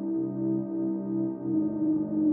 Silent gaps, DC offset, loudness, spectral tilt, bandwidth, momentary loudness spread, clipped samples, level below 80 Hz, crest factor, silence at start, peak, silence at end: none; under 0.1%; -29 LUFS; -11.5 dB/octave; 1.7 kHz; 3 LU; under 0.1%; -68 dBFS; 12 dB; 0 s; -16 dBFS; 0 s